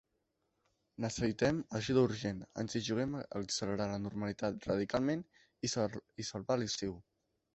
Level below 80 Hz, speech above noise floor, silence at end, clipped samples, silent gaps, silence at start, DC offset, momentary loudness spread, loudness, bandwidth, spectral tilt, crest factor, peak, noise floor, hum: -62 dBFS; 46 dB; 0.55 s; under 0.1%; none; 1 s; under 0.1%; 9 LU; -37 LUFS; 8.2 kHz; -5 dB/octave; 20 dB; -18 dBFS; -82 dBFS; none